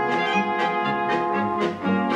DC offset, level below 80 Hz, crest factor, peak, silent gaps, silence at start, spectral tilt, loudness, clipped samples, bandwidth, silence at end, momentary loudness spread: under 0.1%; -62 dBFS; 14 dB; -8 dBFS; none; 0 s; -6 dB/octave; -23 LUFS; under 0.1%; 9.8 kHz; 0 s; 2 LU